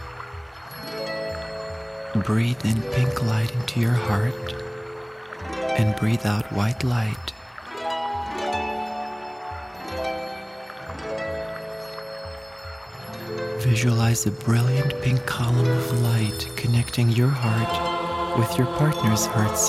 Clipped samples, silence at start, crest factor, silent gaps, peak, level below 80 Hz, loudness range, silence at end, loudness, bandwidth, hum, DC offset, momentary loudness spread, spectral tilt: under 0.1%; 0 s; 18 dB; none; -6 dBFS; -46 dBFS; 10 LU; 0 s; -25 LUFS; 16 kHz; none; under 0.1%; 15 LU; -5.5 dB/octave